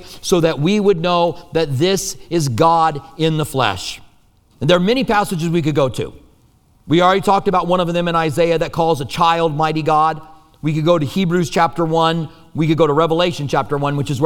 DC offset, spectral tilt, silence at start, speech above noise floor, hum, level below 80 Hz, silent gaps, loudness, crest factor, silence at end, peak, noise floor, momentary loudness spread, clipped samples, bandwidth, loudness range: under 0.1%; -5.5 dB/octave; 0 s; 37 dB; none; -42 dBFS; none; -16 LUFS; 16 dB; 0 s; 0 dBFS; -53 dBFS; 7 LU; under 0.1%; 18 kHz; 2 LU